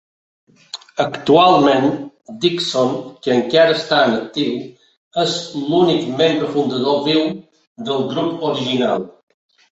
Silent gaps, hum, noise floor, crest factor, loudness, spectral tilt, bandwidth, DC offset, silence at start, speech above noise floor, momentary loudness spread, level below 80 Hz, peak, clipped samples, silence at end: 4.97-5.11 s, 7.67-7.75 s; none; -37 dBFS; 16 dB; -17 LUFS; -5 dB/octave; 8.4 kHz; under 0.1%; 0.75 s; 21 dB; 15 LU; -60 dBFS; 0 dBFS; under 0.1%; 0.65 s